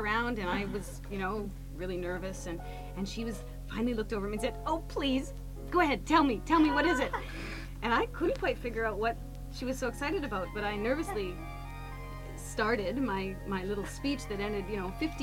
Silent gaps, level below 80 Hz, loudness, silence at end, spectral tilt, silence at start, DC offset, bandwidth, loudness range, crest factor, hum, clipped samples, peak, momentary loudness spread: none; -44 dBFS; -33 LUFS; 0 s; -5.5 dB/octave; 0 s; under 0.1%; 17 kHz; 7 LU; 20 dB; none; under 0.1%; -12 dBFS; 15 LU